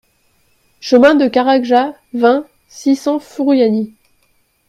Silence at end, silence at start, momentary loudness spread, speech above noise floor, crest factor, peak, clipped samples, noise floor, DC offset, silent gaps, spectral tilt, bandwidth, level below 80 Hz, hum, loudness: 0.8 s; 0.85 s; 11 LU; 46 dB; 14 dB; 0 dBFS; under 0.1%; -59 dBFS; under 0.1%; none; -5 dB/octave; 12 kHz; -58 dBFS; none; -13 LUFS